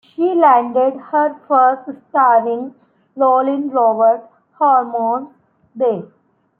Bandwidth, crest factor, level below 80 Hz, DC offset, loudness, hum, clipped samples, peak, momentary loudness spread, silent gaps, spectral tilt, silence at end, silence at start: 3.6 kHz; 14 dB; -72 dBFS; under 0.1%; -15 LUFS; none; under 0.1%; -2 dBFS; 11 LU; none; -10 dB/octave; 0.55 s; 0.2 s